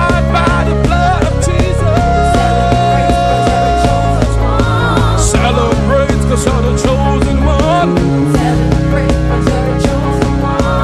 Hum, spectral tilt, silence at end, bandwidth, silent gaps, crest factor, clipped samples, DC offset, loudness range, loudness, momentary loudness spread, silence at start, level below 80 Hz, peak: none; -6 dB/octave; 0 s; 13 kHz; none; 10 dB; under 0.1%; under 0.1%; 1 LU; -12 LUFS; 2 LU; 0 s; -16 dBFS; 0 dBFS